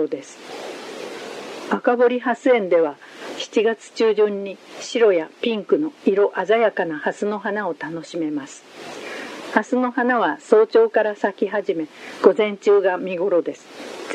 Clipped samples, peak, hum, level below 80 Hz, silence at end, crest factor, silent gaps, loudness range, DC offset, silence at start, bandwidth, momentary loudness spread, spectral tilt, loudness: under 0.1%; 0 dBFS; none; -78 dBFS; 0 s; 20 dB; none; 5 LU; under 0.1%; 0 s; 10.5 kHz; 16 LU; -4.5 dB/octave; -20 LUFS